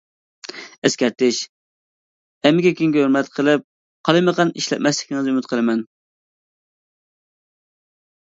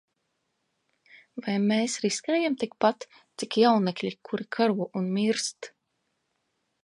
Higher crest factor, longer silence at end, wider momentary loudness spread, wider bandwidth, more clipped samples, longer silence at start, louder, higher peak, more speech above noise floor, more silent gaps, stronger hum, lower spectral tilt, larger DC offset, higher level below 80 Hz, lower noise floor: about the same, 20 dB vs 20 dB; first, 2.45 s vs 1.15 s; about the same, 17 LU vs 17 LU; second, 7.8 kHz vs 11.5 kHz; neither; second, 0.55 s vs 1.35 s; first, -19 LUFS vs -27 LUFS; first, 0 dBFS vs -8 dBFS; first, over 72 dB vs 51 dB; first, 0.78-0.82 s, 1.49-2.41 s, 3.64-4.04 s vs none; neither; about the same, -4.5 dB/octave vs -4.5 dB/octave; neither; first, -68 dBFS vs -78 dBFS; first, under -90 dBFS vs -78 dBFS